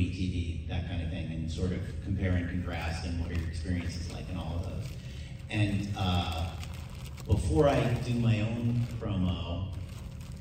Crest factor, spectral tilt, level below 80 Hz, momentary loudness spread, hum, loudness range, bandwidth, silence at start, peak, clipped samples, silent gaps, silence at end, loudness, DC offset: 20 dB; -7 dB/octave; -40 dBFS; 13 LU; none; 5 LU; 15.5 kHz; 0 s; -12 dBFS; under 0.1%; none; 0 s; -32 LUFS; under 0.1%